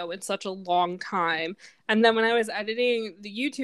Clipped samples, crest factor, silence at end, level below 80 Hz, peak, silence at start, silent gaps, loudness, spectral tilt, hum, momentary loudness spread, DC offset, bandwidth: under 0.1%; 22 dB; 0 s; -78 dBFS; -6 dBFS; 0 s; none; -26 LUFS; -4 dB/octave; none; 11 LU; under 0.1%; 12.5 kHz